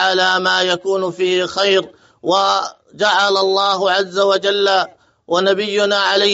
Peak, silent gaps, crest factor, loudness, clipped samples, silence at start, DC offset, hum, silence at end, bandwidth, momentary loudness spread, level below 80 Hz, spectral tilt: -2 dBFS; none; 14 dB; -15 LUFS; under 0.1%; 0 s; under 0.1%; none; 0 s; 8 kHz; 6 LU; -66 dBFS; -0.5 dB/octave